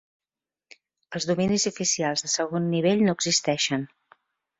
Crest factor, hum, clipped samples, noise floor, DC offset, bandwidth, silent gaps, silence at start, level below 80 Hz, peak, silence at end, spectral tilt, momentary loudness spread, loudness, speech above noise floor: 18 dB; none; under 0.1%; under -90 dBFS; under 0.1%; 8 kHz; none; 1.1 s; -62 dBFS; -8 dBFS; 0.75 s; -3.5 dB/octave; 9 LU; -24 LUFS; over 66 dB